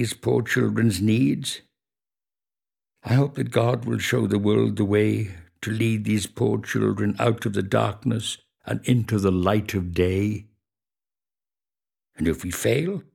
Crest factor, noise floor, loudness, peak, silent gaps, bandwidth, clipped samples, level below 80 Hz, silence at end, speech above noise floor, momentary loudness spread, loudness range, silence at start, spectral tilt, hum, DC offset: 18 dB; under -90 dBFS; -23 LUFS; -6 dBFS; none; 17 kHz; under 0.1%; -52 dBFS; 0.15 s; over 68 dB; 8 LU; 3 LU; 0 s; -6 dB/octave; none; under 0.1%